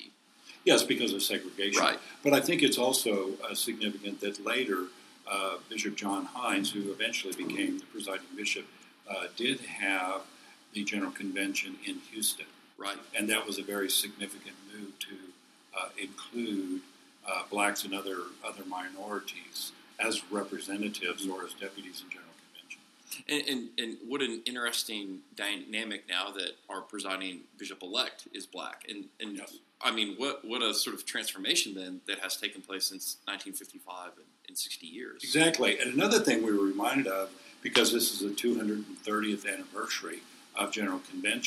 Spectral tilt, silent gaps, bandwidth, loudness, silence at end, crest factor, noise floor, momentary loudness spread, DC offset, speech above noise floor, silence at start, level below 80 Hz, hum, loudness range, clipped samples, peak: -2 dB/octave; none; 15.5 kHz; -32 LUFS; 0 s; 26 dB; -56 dBFS; 16 LU; under 0.1%; 23 dB; 0 s; -86 dBFS; none; 8 LU; under 0.1%; -6 dBFS